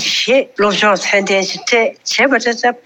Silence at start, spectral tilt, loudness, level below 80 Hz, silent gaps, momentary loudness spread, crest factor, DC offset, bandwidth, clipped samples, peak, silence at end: 0 s; -2.5 dB/octave; -13 LUFS; -60 dBFS; none; 4 LU; 12 dB; under 0.1%; 18 kHz; under 0.1%; -2 dBFS; 0.1 s